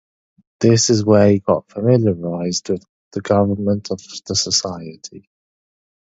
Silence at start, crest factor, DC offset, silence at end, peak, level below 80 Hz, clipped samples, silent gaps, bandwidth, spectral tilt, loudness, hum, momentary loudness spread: 0.6 s; 18 dB; under 0.1%; 0.85 s; 0 dBFS; -46 dBFS; under 0.1%; 2.89-3.11 s; 8 kHz; -5 dB/octave; -17 LUFS; none; 17 LU